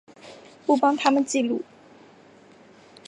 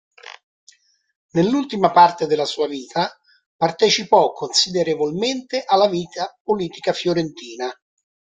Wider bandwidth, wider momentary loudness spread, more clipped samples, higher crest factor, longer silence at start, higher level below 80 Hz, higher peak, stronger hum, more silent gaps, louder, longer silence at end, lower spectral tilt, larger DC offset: first, 11 kHz vs 9.4 kHz; first, 24 LU vs 14 LU; neither; about the same, 22 dB vs 20 dB; about the same, 0.25 s vs 0.3 s; second, -76 dBFS vs -62 dBFS; second, -4 dBFS vs 0 dBFS; neither; second, none vs 0.43-0.67 s, 1.15-1.29 s, 3.46-3.59 s, 6.40-6.45 s; second, -23 LUFS vs -19 LUFS; first, 1.45 s vs 0.65 s; about the same, -3 dB/octave vs -4 dB/octave; neither